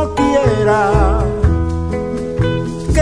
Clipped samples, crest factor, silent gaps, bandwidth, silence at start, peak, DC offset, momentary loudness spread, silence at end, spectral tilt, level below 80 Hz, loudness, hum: under 0.1%; 14 dB; none; 10.5 kHz; 0 s; 0 dBFS; under 0.1%; 7 LU; 0 s; -7 dB/octave; -22 dBFS; -15 LUFS; none